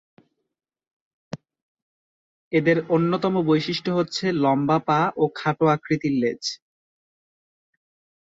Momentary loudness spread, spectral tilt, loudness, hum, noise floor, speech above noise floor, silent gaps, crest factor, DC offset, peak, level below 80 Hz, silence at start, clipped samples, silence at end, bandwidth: 13 LU; -6 dB/octave; -22 LUFS; none; under -90 dBFS; over 69 dB; 1.62-2.51 s; 18 dB; under 0.1%; -6 dBFS; -64 dBFS; 1.35 s; under 0.1%; 1.7 s; 7.8 kHz